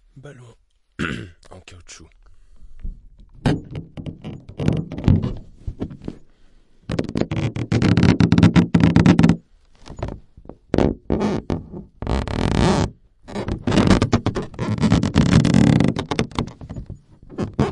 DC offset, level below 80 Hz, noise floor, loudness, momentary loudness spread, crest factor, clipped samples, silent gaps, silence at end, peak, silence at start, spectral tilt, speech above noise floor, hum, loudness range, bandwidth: under 0.1%; -34 dBFS; -50 dBFS; -19 LUFS; 22 LU; 20 dB; under 0.1%; none; 0 s; -2 dBFS; 0.15 s; -7 dB/octave; 15 dB; none; 13 LU; 11 kHz